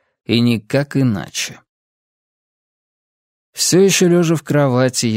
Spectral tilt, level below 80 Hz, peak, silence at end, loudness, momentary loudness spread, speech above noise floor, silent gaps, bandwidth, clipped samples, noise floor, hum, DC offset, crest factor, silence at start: -4.5 dB/octave; -58 dBFS; 0 dBFS; 0 s; -15 LUFS; 11 LU; over 75 dB; 1.69-3.53 s; 16 kHz; under 0.1%; under -90 dBFS; none; under 0.1%; 16 dB; 0.3 s